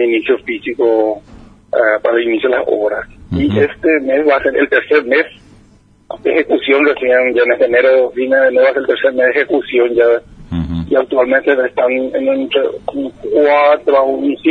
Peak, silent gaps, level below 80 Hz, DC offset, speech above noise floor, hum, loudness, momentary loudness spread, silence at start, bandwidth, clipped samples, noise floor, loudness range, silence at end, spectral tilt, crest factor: 0 dBFS; none; -42 dBFS; under 0.1%; 35 dB; none; -13 LUFS; 9 LU; 0 s; 4.9 kHz; under 0.1%; -47 dBFS; 3 LU; 0 s; -7.5 dB/octave; 14 dB